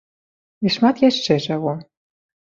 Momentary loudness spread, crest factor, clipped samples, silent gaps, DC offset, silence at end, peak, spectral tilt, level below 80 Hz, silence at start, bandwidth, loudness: 10 LU; 18 dB; under 0.1%; none; under 0.1%; 0.6 s; -2 dBFS; -5.5 dB/octave; -60 dBFS; 0.6 s; 7.6 kHz; -19 LUFS